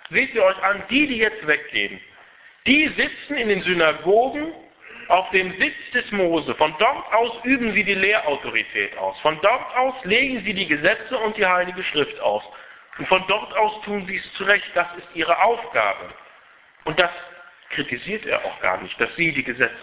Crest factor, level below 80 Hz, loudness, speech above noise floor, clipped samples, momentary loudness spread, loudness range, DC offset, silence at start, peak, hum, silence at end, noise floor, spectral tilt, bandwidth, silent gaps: 20 dB; -56 dBFS; -20 LUFS; 30 dB; under 0.1%; 9 LU; 3 LU; under 0.1%; 0.1 s; -2 dBFS; none; 0 s; -51 dBFS; -7.5 dB/octave; 4 kHz; none